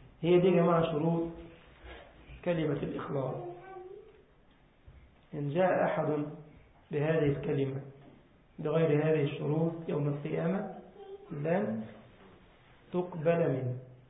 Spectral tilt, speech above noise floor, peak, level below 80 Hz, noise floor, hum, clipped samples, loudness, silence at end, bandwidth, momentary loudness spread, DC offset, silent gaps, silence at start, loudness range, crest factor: -6 dB/octave; 33 dB; -16 dBFS; -62 dBFS; -63 dBFS; none; under 0.1%; -31 LUFS; 0.15 s; 3.9 kHz; 22 LU; under 0.1%; none; 0 s; 7 LU; 18 dB